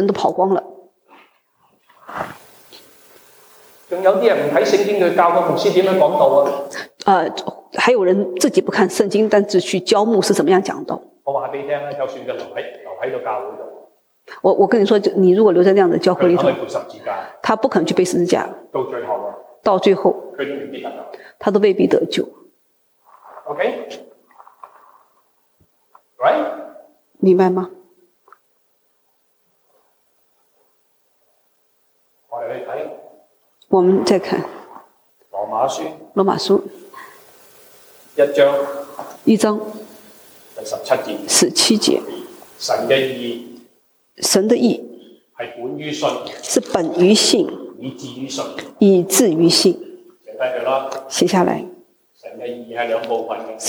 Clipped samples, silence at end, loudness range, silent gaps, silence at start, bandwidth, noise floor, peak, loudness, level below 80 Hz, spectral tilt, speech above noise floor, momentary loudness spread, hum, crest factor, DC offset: under 0.1%; 0 s; 10 LU; none; 0 s; over 20 kHz; -63 dBFS; 0 dBFS; -17 LUFS; -66 dBFS; -4 dB/octave; 47 dB; 18 LU; none; 18 dB; under 0.1%